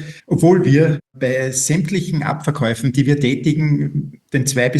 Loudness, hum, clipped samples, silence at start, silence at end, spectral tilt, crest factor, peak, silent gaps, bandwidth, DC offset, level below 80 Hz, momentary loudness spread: -17 LUFS; none; under 0.1%; 0 s; 0 s; -5.5 dB/octave; 16 dB; 0 dBFS; none; 12.5 kHz; under 0.1%; -52 dBFS; 8 LU